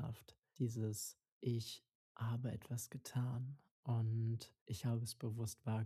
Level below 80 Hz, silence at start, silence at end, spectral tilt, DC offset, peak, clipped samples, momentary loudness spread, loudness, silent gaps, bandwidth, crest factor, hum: -74 dBFS; 0 s; 0 s; -6 dB/octave; under 0.1%; -30 dBFS; under 0.1%; 9 LU; -44 LUFS; 0.38-0.42 s, 1.32-1.41 s, 1.95-2.15 s, 3.71-3.83 s, 4.61-4.66 s; 14.5 kHz; 14 dB; none